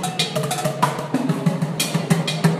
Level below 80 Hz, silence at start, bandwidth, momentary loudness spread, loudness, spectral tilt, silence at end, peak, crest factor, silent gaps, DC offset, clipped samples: -60 dBFS; 0 s; 15.5 kHz; 3 LU; -21 LUFS; -5 dB/octave; 0 s; -2 dBFS; 18 dB; none; under 0.1%; under 0.1%